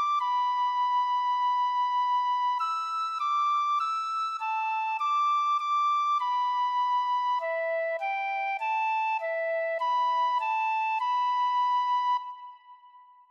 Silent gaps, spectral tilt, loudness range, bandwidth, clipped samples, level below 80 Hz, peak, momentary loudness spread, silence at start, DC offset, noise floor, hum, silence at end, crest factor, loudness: none; 4 dB/octave; 2 LU; 8.4 kHz; under 0.1%; under -90 dBFS; -20 dBFS; 4 LU; 0 s; under 0.1%; -54 dBFS; none; 0.3 s; 8 dB; -27 LUFS